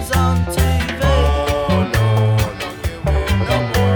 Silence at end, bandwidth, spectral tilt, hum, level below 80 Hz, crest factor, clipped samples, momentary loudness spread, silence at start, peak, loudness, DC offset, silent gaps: 0 s; over 20 kHz; -6 dB/octave; none; -22 dBFS; 14 dB; under 0.1%; 6 LU; 0 s; -2 dBFS; -17 LUFS; under 0.1%; none